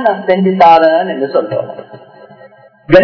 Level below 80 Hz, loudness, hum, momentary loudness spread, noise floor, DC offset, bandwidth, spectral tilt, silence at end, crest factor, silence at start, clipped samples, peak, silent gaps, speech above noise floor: -44 dBFS; -10 LUFS; none; 15 LU; -40 dBFS; under 0.1%; 5.4 kHz; -8 dB/octave; 0 s; 12 dB; 0 s; 2%; 0 dBFS; none; 30 dB